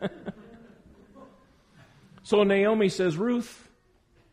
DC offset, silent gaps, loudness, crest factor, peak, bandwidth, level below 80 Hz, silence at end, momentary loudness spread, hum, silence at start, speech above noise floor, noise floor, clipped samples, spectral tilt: under 0.1%; none; -25 LUFS; 18 dB; -10 dBFS; 12 kHz; -64 dBFS; 0.8 s; 20 LU; none; 0 s; 39 dB; -63 dBFS; under 0.1%; -6 dB/octave